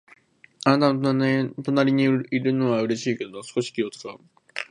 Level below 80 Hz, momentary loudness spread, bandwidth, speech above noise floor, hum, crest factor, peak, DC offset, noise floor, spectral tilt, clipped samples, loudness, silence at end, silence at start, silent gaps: -70 dBFS; 11 LU; 10.5 kHz; 32 dB; none; 22 dB; -2 dBFS; under 0.1%; -55 dBFS; -6.5 dB/octave; under 0.1%; -23 LUFS; 0.05 s; 0.65 s; none